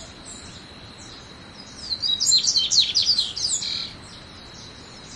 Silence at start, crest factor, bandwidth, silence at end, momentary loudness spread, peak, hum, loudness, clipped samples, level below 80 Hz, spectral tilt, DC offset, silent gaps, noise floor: 0 s; 20 dB; 12 kHz; 0 s; 24 LU; -6 dBFS; none; -19 LUFS; under 0.1%; -54 dBFS; 0.5 dB/octave; under 0.1%; none; -42 dBFS